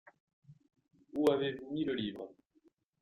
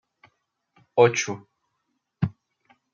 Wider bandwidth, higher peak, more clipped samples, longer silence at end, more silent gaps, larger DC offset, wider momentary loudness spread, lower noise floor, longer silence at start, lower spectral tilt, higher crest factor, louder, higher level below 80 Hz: first, 15.5 kHz vs 7.4 kHz; second, -16 dBFS vs -4 dBFS; neither; about the same, 0.7 s vs 0.65 s; neither; neither; first, 16 LU vs 12 LU; second, -71 dBFS vs -77 dBFS; second, 0.5 s vs 0.95 s; first, -6.5 dB/octave vs -5 dB/octave; about the same, 22 dB vs 24 dB; second, -35 LUFS vs -24 LUFS; second, -74 dBFS vs -64 dBFS